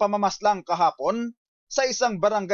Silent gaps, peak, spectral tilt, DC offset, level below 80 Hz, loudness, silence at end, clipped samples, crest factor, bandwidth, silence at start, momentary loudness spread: 1.37-1.67 s; -10 dBFS; -3.5 dB/octave; under 0.1%; -66 dBFS; -24 LUFS; 0 s; under 0.1%; 14 dB; 7.4 kHz; 0 s; 7 LU